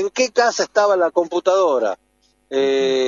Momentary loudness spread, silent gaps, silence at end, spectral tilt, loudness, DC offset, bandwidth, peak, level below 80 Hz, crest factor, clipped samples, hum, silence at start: 7 LU; none; 0 s; -2.5 dB/octave; -18 LUFS; under 0.1%; 7.6 kHz; -2 dBFS; -68 dBFS; 16 dB; under 0.1%; none; 0 s